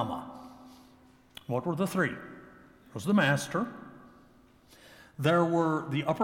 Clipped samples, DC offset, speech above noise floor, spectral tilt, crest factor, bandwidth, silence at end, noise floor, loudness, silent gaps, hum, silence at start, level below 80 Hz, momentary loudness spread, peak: under 0.1%; under 0.1%; 31 dB; -6 dB/octave; 20 dB; 17.5 kHz; 0 s; -59 dBFS; -29 LUFS; none; none; 0 s; -68 dBFS; 24 LU; -12 dBFS